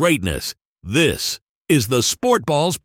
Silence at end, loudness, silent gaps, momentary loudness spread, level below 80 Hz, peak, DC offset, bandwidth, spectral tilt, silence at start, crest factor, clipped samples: 0.05 s; -19 LUFS; 0.65-0.76 s, 1.42-1.61 s; 11 LU; -42 dBFS; -4 dBFS; under 0.1%; 17.5 kHz; -4 dB/octave; 0 s; 16 dB; under 0.1%